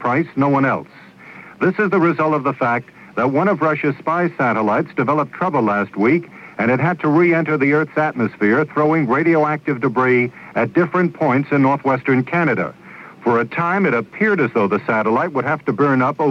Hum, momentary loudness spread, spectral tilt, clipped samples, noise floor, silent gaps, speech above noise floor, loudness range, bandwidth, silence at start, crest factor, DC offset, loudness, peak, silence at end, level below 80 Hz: none; 5 LU; -9 dB/octave; under 0.1%; -40 dBFS; none; 23 dB; 2 LU; 7 kHz; 0 s; 14 dB; under 0.1%; -17 LUFS; -4 dBFS; 0 s; -64 dBFS